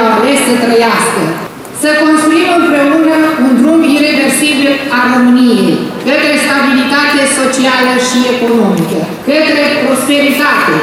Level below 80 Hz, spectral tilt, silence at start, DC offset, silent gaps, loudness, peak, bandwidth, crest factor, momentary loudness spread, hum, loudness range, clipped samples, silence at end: -52 dBFS; -3.5 dB/octave; 0 s; under 0.1%; none; -9 LUFS; 0 dBFS; 16 kHz; 8 dB; 5 LU; none; 1 LU; under 0.1%; 0 s